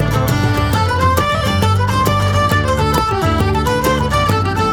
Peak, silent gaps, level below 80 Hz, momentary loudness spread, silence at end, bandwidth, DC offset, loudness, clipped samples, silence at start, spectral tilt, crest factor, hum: 0 dBFS; none; -26 dBFS; 1 LU; 0 s; 19.5 kHz; under 0.1%; -15 LUFS; under 0.1%; 0 s; -5.5 dB/octave; 14 dB; none